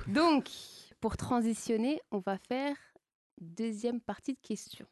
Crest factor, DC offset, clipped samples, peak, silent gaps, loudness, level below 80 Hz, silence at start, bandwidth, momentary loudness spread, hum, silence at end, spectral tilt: 18 dB; under 0.1%; under 0.1%; -16 dBFS; 3.15-3.37 s; -34 LUFS; -58 dBFS; 0 s; 12.5 kHz; 16 LU; none; 0.1 s; -5 dB/octave